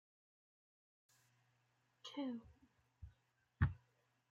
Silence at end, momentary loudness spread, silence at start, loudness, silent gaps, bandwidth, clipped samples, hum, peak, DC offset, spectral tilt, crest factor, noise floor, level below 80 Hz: 0.55 s; 22 LU; 2.05 s; -45 LUFS; none; 7.6 kHz; under 0.1%; none; -24 dBFS; under 0.1%; -7 dB/octave; 26 dB; -81 dBFS; -60 dBFS